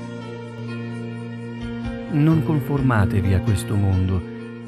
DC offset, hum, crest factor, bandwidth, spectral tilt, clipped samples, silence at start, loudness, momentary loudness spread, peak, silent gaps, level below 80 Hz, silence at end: under 0.1%; none; 18 dB; 14 kHz; -8 dB/octave; under 0.1%; 0 s; -22 LUFS; 14 LU; -4 dBFS; none; -40 dBFS; 0 s